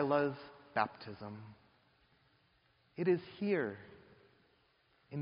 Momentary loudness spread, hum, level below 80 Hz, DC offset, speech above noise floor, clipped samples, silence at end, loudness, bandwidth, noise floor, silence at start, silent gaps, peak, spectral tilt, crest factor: 19 LU; none; -78 dBFS; under 0.1%; 37 dB; under 0.1%; 0 s; -37 LUFS; 5.2 kHz; -73 dBFS; 0 s; none; -16 dBFS; -5.5 dB/octave; 24 dB